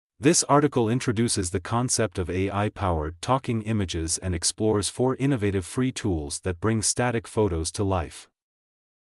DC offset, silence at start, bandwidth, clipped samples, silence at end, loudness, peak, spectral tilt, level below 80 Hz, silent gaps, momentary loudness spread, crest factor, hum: under 0.1%; 0.2 s; 13.5 kHz; under 0.1%; 0.9 s; -25 LUFS; -8 dBFS; -4.5 dB/octave; -44 dBFS; none; 7 LU; 18 dB; none